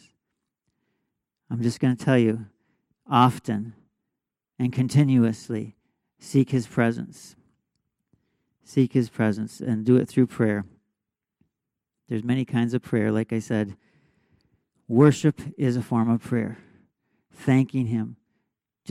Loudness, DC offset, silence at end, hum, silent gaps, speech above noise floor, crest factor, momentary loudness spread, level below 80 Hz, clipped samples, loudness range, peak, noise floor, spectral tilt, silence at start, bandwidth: -24 LUFS; under 0.1%; 0.75 s; none; none; 63 dB; 20 dB; 13 LU; -66 dBFS; under 0.1%; 3 LU; -6 dBFS; -86 dBFS; -7.5 dB/octave; 1.5 s; 12.5 kHz